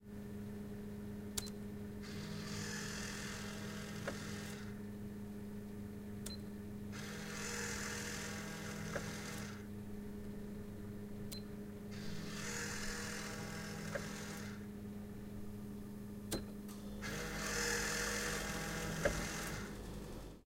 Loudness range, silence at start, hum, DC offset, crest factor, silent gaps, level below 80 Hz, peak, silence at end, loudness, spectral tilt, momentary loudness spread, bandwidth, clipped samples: 7 LU; 0 s; none; under 0.1%; 24 dB; none; -56 dBFS; -22 dBFS; 0 s; -44 LUFS; -3.5 dB/octave; 11 LU; 16 kHz; under 0.1%